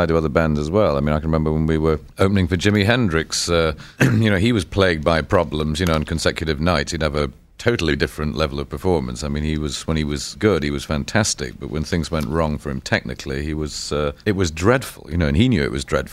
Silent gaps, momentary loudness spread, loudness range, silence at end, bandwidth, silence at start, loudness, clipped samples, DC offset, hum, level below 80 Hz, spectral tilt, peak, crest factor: none; 7 LU; 4 LU; 0 s; 15.5 kHz; 0 s; -20 LUFS; under 0.1%; under 0.1%; none; -32 dBFS; -5.5 dB/octave; -2 dBFS; 18 dB